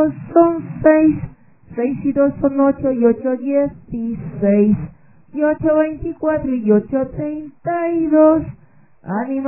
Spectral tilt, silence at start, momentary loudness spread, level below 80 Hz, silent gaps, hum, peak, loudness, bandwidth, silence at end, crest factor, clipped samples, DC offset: -13 dB/octave; 0 s; 13 LU; -44 dBFS; none; none; 0 dBFS; -17 LUFS; 3 kHz; 0 s; 16 dB; under 0.1%; 0.3%